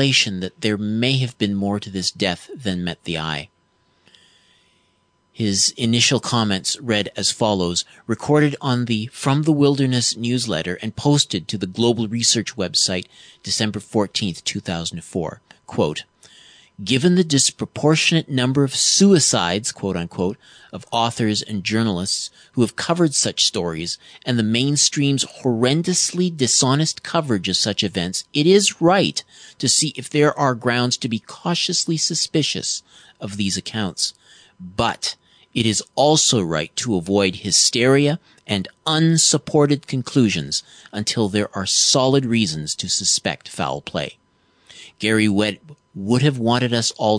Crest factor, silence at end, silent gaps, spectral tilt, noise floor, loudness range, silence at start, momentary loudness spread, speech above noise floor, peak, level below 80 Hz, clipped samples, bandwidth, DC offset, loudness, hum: 18 dB; 0 s; none; -3.5 dB/octave; -63 dBFS; 6 LU; 0 s; 11 LU; 44 dB; -2 dBFS; -56 dBFS; under 0.1%; 10 kHz; under 0.1%; -19 LUFS; none